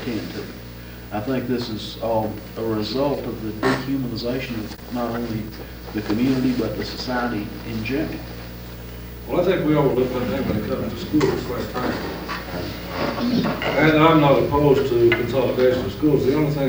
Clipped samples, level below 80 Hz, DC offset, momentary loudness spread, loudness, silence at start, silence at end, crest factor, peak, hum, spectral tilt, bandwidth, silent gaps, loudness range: under 0.1%; -40 dBFS; under 0.1%; 14 LU; -22 LUFS; 0 s; 0 s; 18 dB; -2 dBFS; 60 Hz at -45 dBFS; -6.5 dB/octave; 20 kHz; none; 8 LU